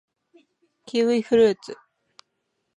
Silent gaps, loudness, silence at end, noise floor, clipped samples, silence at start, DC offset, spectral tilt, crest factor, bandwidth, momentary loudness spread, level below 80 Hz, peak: none; -21 LUFS; 1.05 s; -76 dBFS; under 0.1%; 0.95 s; under 0.1%; -5.5 dB/octave; 18 dB; 10 kHz; 21 LU; -66 dBFS; -8 dBFS